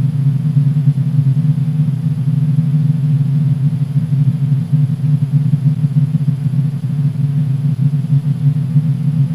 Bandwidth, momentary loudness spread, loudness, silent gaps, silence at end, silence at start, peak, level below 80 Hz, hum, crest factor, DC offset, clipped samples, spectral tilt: 4.9 kHz; 2 LU; -15 LUFS; none; 0 s; 0 s; -2 dBFS; -50 dBFS; none; 12 dB; 0.4%; under 0.1%; -10 dB/octave